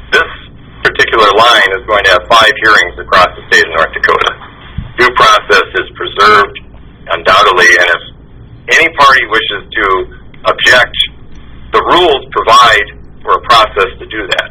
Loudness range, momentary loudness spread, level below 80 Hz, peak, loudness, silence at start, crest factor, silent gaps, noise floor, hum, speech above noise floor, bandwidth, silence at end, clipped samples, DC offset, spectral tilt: 2 LU; 11 LU; -34 dBFS; 0 dBFS; -7 LUFS; 0 s; 10 dB; none; -33 dBFS; none; 25 dB; over 20 kHz; 0 s; 3%; under 0.1%; -2.5 dB/octave